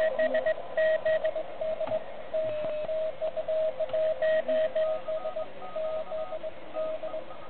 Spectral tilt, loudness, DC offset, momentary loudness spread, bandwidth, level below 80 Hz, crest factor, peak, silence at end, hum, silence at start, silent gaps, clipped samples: -8 dB/octave; -31 LUFS; 1%; 10 LU; 4.4 kHz; -64 dBFS; 12 dB; -16 dBFS; 0 s; none; 0 s; none; under 0.1%